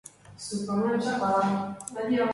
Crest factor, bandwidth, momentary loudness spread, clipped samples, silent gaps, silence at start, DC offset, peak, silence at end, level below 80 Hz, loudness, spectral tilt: 14 dB; 11.5 kHz; 11 LU; under 0.1%; none; 0.05 s; under 0.1%; -14 dBFS; 0 s; -66 dBFS; -28 LUFS; -5.5 dB/octave